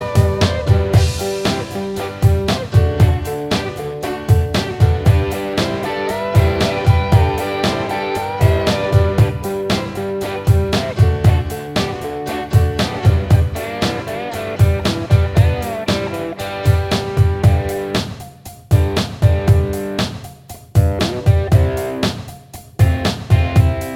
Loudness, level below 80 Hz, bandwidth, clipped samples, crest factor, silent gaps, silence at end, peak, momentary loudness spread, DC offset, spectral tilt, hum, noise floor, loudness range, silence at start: -17 LUFS; -26 dBFS; 16.5 kHz; under 0.1%; 16 dB; none; 0 s; 0 dBFS; 10 LU; under 0.1%; -6.5 dB/octave; none; -36 dBFS; 2 LU; 0 s